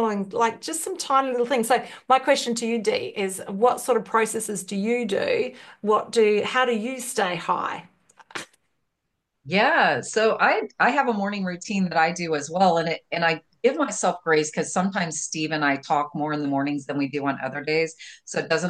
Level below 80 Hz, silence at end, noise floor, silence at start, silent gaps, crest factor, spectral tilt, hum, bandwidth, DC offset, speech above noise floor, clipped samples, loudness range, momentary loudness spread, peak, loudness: -72 dBFS; 0 s; -78 dBFS; 0 s; none; 18 dB; -4 dB/octave; none; 12.5 kHz; under 0.1%; 55 dB; under 0.1%; 3 LU; 8 LU; -6 dBFS; -23 LUFS